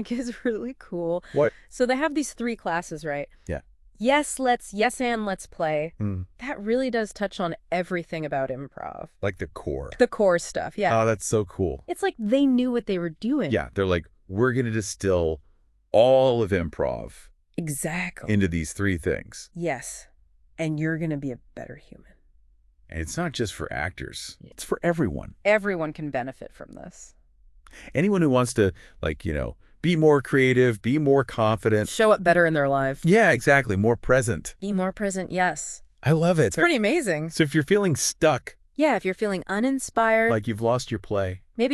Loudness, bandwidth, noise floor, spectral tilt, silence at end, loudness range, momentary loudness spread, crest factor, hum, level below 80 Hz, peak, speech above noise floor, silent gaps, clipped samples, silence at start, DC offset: -24 LUFS; 13.5 kHz; -58 dBFS; -5.5 dB/octave; 0 s; 9 LU; 14 LU; 20 dB; none; -46 dBFS; -6 dBFS; 34 dB; none; under 0.1%; 0 s; under 0.1%